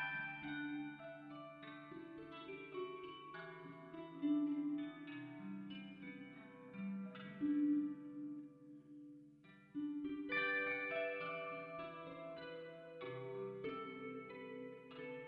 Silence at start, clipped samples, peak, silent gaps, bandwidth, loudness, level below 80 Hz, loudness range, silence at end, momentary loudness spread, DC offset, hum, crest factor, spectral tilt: 0 s; under 0.1%; -28 dBFS; none; 5 kHz; -45 LUFS; -82 dBFS; 7 LU; 0 s; 16 LU; under 0.1%; none; 18 dB; -4 dB/octave